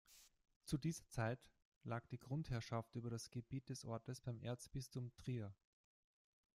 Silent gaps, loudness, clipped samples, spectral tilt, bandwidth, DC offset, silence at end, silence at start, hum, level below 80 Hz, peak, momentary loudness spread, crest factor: 0.56-0.61 s, 1.65-1.81 s; -49 LUFS; under 0.1%; -6 dB/octave; 15.5 kHz; under 0.1%; 1 s; 0.1 s; none; -68 dBFS; -28 dBFS; 8 LU; 20 dB